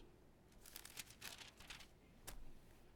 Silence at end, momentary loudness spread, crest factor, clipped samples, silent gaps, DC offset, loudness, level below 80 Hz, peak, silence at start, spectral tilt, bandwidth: 0 s; 14 LU; 26 dB; under 0.1%; none; under 0.1%; -57 LUFS; -64 dBFS; -32 dBFS; 0 s; -1.5 dB/octave; 19 kHz